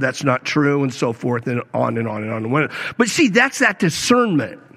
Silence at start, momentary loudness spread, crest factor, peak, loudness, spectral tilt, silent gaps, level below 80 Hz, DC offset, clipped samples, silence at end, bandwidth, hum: 0 s; 8 LU; 18 dB; -2 dBFS; -18 LUFS; -4.5 dB/octave; none; -60 dBFS; under 0.1%; under 0.1%; 0.2 s; 15 kHz; none